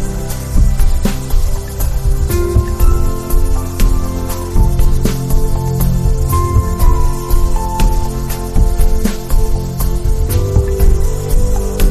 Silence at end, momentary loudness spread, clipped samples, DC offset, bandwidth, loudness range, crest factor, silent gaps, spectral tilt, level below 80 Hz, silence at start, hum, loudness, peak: 0 s; 5 LU; under 0.1%; under 0.1%; 14.5 kHz; 1 LU; 10 dB; none; -6 dB/octave; -14 dBFS; 0 s; none; -17 LUFS; 0 dBFS